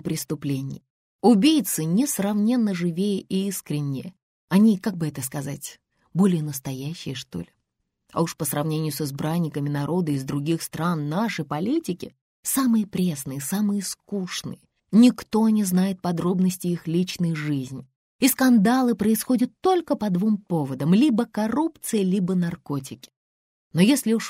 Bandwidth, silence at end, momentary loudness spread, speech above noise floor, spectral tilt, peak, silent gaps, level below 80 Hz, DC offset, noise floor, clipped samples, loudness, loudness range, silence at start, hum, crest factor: 16 kHz; 0 s; 13 LU; 55 dB; -5.5 dB/octave; -6 dBFS; 0.90-1.19 s, 4.22-4.48 s, 12.21-12.43 s, 17.96-18.19 s, 23.16-23.71 s; -62 dBFS; under 0.1%; -77 dBFS; under 0.1%; -23 LUFS; 5 LU; 0.05 s; none; 18 dB